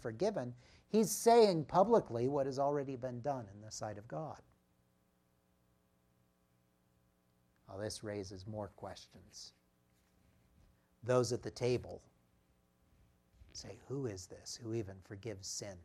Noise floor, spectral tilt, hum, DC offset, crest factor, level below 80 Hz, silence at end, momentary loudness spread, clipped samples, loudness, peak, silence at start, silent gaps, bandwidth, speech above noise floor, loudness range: -76 dBFS; -5 dB/octave; none; under 0.1%; 22 dB; -72 dBFS; 0 s; 22 LU; under 0.1%; -36 LUFS; -16 dBFS; 0 s; none; 15.5 kHz; 39 dB; 17 LU